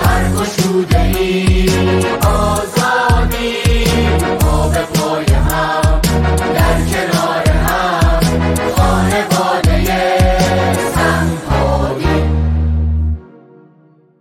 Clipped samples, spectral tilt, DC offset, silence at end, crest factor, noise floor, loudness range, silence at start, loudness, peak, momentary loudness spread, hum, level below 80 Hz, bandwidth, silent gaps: under 0.1%; -5.5 dB/octave; under 0.1%; 0.95 s; 12 dB; -48 dBFS; 1 LU; 0 s; -14 LUFS; -2 dBFS; 3 LU; none; -18 dBFS; 17 kHz; none